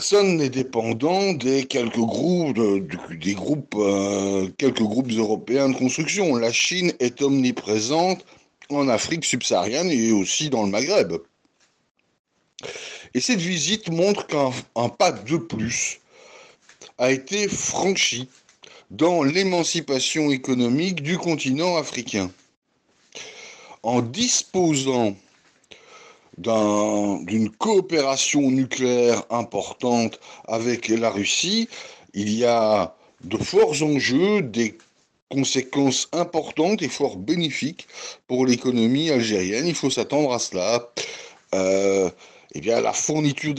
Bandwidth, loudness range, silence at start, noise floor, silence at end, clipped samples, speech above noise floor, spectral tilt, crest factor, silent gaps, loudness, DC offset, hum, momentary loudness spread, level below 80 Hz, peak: 12 kHz; 3 LU; 0 s; -64 dBFS; 0 s; under 0.1%; 43 dB; -4 dB/octave; 14 dB; 11.91-11.95 s, 12.19-12.24 s, 22.57-22.62 s, 35.22-35.27 s; -22 LUFS; under 0.1%; none; 10 LU; -64 dBFS; -8 dBFS